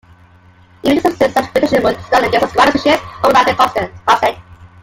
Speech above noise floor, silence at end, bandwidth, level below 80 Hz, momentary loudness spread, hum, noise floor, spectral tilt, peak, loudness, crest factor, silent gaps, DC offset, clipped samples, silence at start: 33 dB; 0.15 s; 17 kHz; -44 dBFS; 5 LU; none; -45 dBFS; -4.5 dB/octave; 0 dBFS; -13 LUFS; 14 dB; none; under 0.1%; under 0.1%; 0.85 s